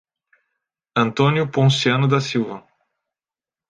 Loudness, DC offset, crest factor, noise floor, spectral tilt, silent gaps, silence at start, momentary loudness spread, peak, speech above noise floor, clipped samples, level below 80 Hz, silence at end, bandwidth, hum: -19 LUFS; under 0.1%; 18 dB; under -90 dBFS; -6 dB/octave; none; 0.95 s; 9 LU; -4 dBFS; over 72 dB; under 0.1%; -62 dBFS; 1.1 s; 9.2 kHz; none